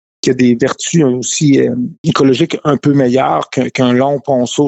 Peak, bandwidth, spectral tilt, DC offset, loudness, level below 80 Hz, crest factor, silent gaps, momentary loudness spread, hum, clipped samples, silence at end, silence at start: -2 dBFS; 8.2 kHz; -5.5 dB/octave; under 0.1%; -12 LUFS; -52 dBFS; 10 dB; 1.98-2.04 s; 5 LU; none; under 0.1%; 0 s; 0.25 s